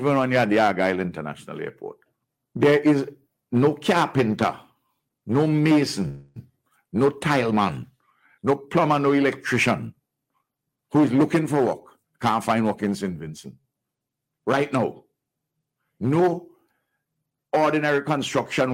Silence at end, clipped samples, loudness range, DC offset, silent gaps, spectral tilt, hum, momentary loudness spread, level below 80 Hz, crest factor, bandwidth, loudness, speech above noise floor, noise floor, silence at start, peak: 0 s; under 0.1%; 5 LU; under 0.1%; none; -6.5 dB/octave; none; 15 LU; -62 dBFS; 18 dB; 16 kHz; -22 LUFS; 62 dB; -83 dBFS; 0 s; -6 dBFS